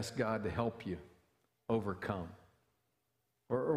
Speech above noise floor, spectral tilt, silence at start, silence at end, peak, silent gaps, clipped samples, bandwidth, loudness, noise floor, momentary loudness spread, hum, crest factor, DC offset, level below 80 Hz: 46 dB; -6.5 dB/octave; 0 s; 0 s; -20 dBFS; none; under 0.1%; 15.5 kHz; -39 LUFS; -83 dBFS; 11 LU; none; 20 dB; under 0.1%; -64 dBFS